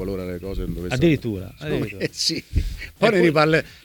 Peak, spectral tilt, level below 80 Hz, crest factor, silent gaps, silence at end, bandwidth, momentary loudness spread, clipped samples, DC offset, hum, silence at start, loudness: -4 dBFS; -5.5 dB/octave; -34 dBFS; 18 dB; none; 0.1 s; 19 kHz; 13 LU; under 0.1%; under 0.1%; none; 0 s; -22 LUFS